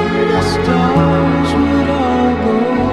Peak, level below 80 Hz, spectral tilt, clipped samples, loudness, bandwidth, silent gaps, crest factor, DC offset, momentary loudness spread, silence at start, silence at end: 0 dBFS; -28 dBFS; -7 dB/octave; under 0.1%; -13 LUFS; 12 kHz; none; 12 dB; 0.7%; 2 LU; 0 s; 0 s